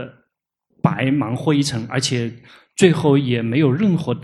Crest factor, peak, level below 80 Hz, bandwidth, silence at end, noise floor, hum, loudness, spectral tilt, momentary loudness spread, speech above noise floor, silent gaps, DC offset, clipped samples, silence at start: 18 dB; 0 dBFS; -56 dBFS; 12.5 kHz; 0 s; -72 dBFS; none; -18 LUFS; -6 dB/octave; 8 LU; 55 dB; none; under 0.1%; under 0.1%; 0 s